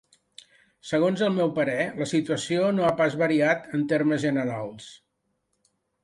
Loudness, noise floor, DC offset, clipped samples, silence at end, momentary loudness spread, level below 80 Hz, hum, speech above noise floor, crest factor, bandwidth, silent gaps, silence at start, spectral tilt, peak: -25 LUFS; -76 dBFS; under 0.1%; under 0.1%; 1.1 s; 11 LU; -66 dBFS; none; 52 dB; 16 dB; 11.5 kHz; none; 0.85 s; -6 dB/octave; -8 dBFS